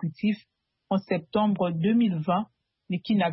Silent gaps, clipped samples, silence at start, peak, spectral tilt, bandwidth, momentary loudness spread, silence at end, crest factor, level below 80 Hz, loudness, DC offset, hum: none; under 0.1%; 0 s; -12 dBFS; -11.5 dB/octave; 5.8 kHz; 10 LU; 0 s; 14 dB; -66 dBFS; -27 LUFS; under 0.1%; none